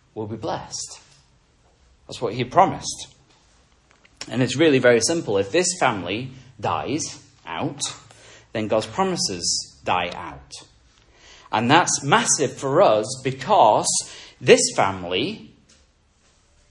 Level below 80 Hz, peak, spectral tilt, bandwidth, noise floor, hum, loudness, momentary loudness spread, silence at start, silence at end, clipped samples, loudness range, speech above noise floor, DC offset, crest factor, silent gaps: -58 dBFS; 0 dBFS; -3.5 dB/octave; 11.5 kHz; -60 dBFS; none; -21 LUFS; 19 LU; 0.15 s; 1.25 s; under 0.1%; 7 LU; 39 dB; under 0.1%; 22 dB; none